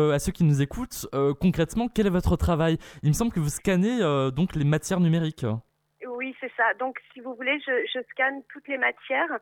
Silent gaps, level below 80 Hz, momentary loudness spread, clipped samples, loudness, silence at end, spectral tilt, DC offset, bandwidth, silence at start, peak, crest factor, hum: none; -42 dBFS; 10 LU; under 0.1%; -25 LUFS; 0.05 s; -6 dB/octave; under 0.1%; 18 kHz; 0 s; -10 dBFS; 16 dB; none